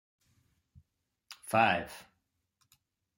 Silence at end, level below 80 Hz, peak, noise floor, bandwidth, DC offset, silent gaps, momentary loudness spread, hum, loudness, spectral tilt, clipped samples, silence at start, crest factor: 1.15 s; -72 dBFS; -12 dBFS; -80 dBFS; 16.5 kHz; under 0.1%; none; 24 LU; none; -29 LUFS; -4.5 dB/octave; under 0.1%; 1.3 s; 26 dB